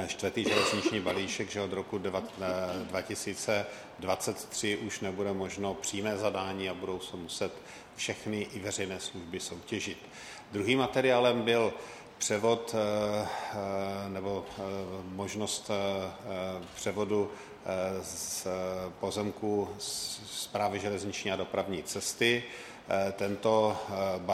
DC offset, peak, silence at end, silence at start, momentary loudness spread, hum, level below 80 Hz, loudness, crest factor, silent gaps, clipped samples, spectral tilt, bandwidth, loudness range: under 0.1%; -12 dBFS; 0 s; 0 s; 11 LU; none; -66 dBFS; -33 LUFS; 22 dB; none; under 0.1%; -3.5 dB/octave; 16 kHz; 6 LU